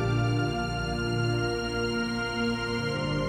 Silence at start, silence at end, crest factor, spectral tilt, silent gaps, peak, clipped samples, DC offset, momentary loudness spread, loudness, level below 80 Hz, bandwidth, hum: 0 s; 0 s; 12 dB; -6 dB/octave; none; -16 dBFS; under 0.1%; under 0.1%; 3 LU; -29 LUFS; -42 dBFS; 11.5 kHz; 60 Hz at -45 dBFS